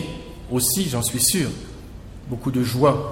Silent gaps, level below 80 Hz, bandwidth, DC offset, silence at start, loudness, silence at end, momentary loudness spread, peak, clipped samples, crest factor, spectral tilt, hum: none; -42 dBFS; 16.5 kHz; under 0.1%; 0 s; -21 LUFS; 0 s; 20 LU; -4 dBFS; under 0.1%; 18 dB; -4 dB/octave; none